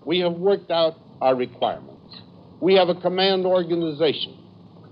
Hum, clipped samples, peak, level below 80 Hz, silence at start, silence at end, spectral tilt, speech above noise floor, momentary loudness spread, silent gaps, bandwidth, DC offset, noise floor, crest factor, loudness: none; under 0.1%; -6 dBFS; -68 dBFS; 0.05 s; 0.6 s; -9 dB/octave; 26 dB; 9 LU; none; 5.4 kHz; under 0.1%; -46 dBFS; 16 dB; -22 LUFS